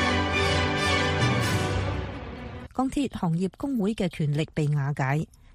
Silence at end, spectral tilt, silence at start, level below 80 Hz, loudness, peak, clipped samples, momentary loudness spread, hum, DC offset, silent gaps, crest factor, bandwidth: 0.3 s; -5.5 dB/octave; 0 s; -42 dBFS; -26 LUFS; -12 dBFS; under 0.1%; 10 LU; none; under 0.1%; none; 16 dB; 15.5 kHz